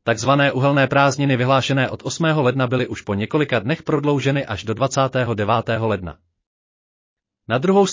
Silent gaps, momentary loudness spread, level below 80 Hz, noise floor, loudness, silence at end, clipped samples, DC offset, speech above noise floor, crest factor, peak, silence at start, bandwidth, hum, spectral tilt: 6.47-7.17 s; 7 LU; -50 dBFS; under -90 dBFS; -19 LUFS; 0 s; under 0.1%; under 0.1%; over 72 dB; 16 dB; -2 dBFS; 0.05 s; 7.8 kHz; none; -5.5 dB/octave